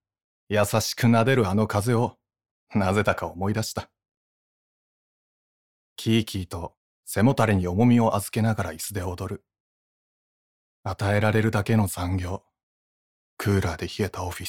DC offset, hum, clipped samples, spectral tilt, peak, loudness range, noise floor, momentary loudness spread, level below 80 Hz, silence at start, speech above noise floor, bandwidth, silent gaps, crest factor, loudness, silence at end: under 0.1%; none; under 0.1%; -6 dB/octave; -6 dBFS; 7 LU; under -90 dBFS; 14 LU; -50 dBFS; 0.5 s; over 67 dB; 17.5 kHz; 2.51-2.67 s, 4.17-5.96 s, 6.77-7.03 s, 9.60-10.83 s, 12.63-13.37 s; 20 dB; -24 LUFS; 0 s